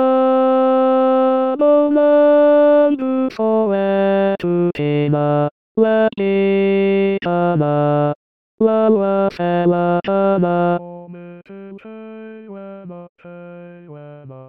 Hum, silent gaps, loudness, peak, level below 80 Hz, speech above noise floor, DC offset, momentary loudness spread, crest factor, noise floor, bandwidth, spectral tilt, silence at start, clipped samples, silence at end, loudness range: none; 5.51-5.75 s, 8.15-8.58 s, 13.09-13.16 s; -15 LUFS; -2 dBFS; -62 dBFS; 21 dB; 0.3%; 22 LU; 14 dB; -37 dBFS; 5.6 kHz; -10 dB/octave; 0 s; under 0.1%; 0.05 s; 10 LU